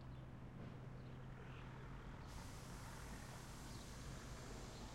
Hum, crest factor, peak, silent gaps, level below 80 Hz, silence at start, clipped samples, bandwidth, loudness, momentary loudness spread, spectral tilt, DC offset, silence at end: none; 14 dB; -40 dBFS; none; -60 dBFS; 0 s; under 0.1%; 16 kHz; -55 LUFS; 2 LU; -5 dB/octave; under 0.1%; 0 s